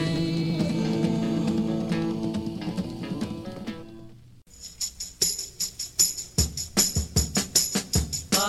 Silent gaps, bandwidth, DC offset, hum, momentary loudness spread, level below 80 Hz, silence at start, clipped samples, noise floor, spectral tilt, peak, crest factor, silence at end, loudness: none; 16.5 kHz; under 0.1%; none; 12 LU; -40 dBFS; 0 s; under 0.1%; -49 dBFS; -3.5 dB/octave; -6 dBFS; 20 dB; 0 s; -26 LUFS